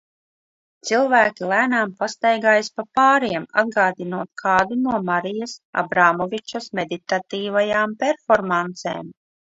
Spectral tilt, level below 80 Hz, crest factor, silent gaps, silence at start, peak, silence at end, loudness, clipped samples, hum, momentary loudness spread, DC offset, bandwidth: -4.5 dB/octave; -62 dBFS; 20 dB; 5.65-5.73 s; 0.85 s; 0 dBFS; 0.45 s; -20 LUFS; under 0.1%; none; 12 LU; under 0.1%; 8 kHz